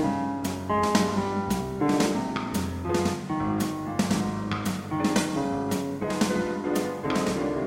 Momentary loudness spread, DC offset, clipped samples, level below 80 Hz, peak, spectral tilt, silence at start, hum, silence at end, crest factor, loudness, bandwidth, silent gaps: 5 LU; under 0.1%; under 0.1%; -50 dBFS; -8 dBFS; -5.5 dB/octave; 0 s; none; 0 s; 18 dB; -27 LUFS; 16.5 kHz; none